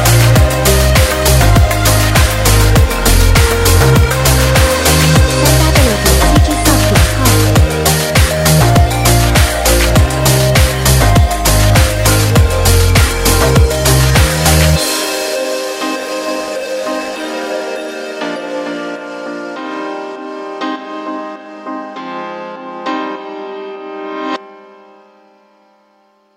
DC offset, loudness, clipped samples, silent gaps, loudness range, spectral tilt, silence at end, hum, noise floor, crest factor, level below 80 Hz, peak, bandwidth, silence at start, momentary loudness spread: under 0.1%; -11 LUFS; under 0.1%; none; 14 LU; -4.5 dB/octave; 1.8 s; none; -53 dBFS; 12 dB; -16 dBFS; 0 dBFS; 16.5 kHz; 0 s; 15 LU